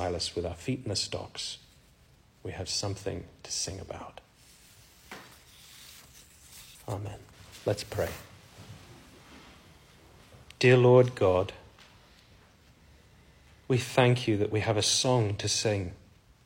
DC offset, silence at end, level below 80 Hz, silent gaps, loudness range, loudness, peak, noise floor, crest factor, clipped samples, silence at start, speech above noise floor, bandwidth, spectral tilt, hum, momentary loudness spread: under 0.1%; 0.5 s; -58 dBFS; none; 14 LU; -28 LUFS; -8 dBFS; -60 dBFS; 24 dB; under 0.1%; 0 s; 33 dB; 16.5 kHz; -4.5 dB/octave; none; 26 LU